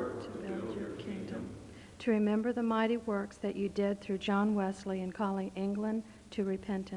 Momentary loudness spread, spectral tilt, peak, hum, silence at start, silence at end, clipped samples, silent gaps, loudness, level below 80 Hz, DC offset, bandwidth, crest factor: 11 LU; -7 dB/octave; -18 dBFS; none; 0 s; 0 s; under 0.1%; none; -35 LUFS; -62 dBFS; under 0.1%; 11 kHz; 16 dB